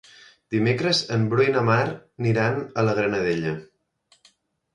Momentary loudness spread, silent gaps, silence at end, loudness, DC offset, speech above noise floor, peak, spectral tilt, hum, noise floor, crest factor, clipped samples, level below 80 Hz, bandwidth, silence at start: 8 LU; none; 1.1 s; -23 LUFS; under 0.1%; 41 dB; -6 dBFS; -6 dB/octave; none; -63 dBFS; 18 dB; under 0.1%; -58 dBFS; 10.5 kHz; 0.5 s